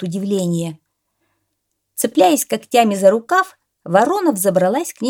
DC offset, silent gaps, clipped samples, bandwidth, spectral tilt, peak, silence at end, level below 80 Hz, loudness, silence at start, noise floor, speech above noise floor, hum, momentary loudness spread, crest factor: under 0.1%; none; under 0.1%; 18.5 kHz; -4.5 dB/octave; 0 dBFS; 0 s; -70 dBFS; -16 LUFS; 0 s; -73 dBFS; 57 dB; none; 9 LU; 16 dB